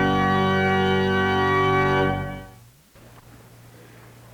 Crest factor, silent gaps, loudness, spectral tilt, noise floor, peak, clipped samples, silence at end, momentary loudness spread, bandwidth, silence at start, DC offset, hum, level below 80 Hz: 14 dB; none; -20 LUFS; -6.5 dB/octave; -50 dBFS; -10 dBFS; under 0.1%; 1.85 s; 9 LU; 19.5 kHz; 0 s; under 0.1%; none; -46 dBFS